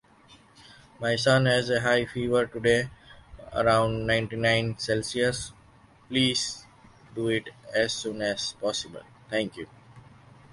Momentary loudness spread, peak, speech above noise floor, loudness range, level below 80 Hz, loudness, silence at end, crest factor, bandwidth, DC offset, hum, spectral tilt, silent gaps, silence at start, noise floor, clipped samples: 12 LU; -8 dBFS; 30 dB; 6 LU; -54 dBFS; -26 LUFS; 0.5 s; 20 dB; 11.5 kHz; under 0.1%; none; -4.5 dB/octave; none; 0.3 s; -56 dBFS; under 0.1%